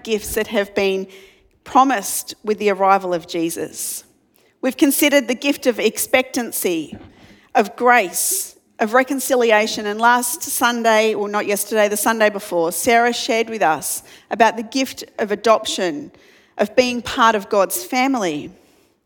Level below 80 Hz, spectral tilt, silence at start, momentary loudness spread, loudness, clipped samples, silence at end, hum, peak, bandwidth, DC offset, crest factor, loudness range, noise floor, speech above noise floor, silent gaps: -56 dBFS; -2.5 dB/octave; 0.05 s; 10 LU; -18 LUFS; under 0.1%; 0.55 s; none; 0 dBFS; 19 kHz; under 0.1%; 18 dB; 3 LU; -58 dBFS; 40 dB; none